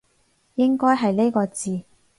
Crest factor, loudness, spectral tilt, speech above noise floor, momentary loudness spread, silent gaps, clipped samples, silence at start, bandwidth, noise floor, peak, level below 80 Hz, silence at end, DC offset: 16 dB; -21 LUFS; -6 dB/octave; 44 dB; 12 LU; none; under 0.1%; 0.55 s; 11.5 kHz; -64 dBFS; -6 dBFS; -64 dBFS; 0.35 s; under 0.1%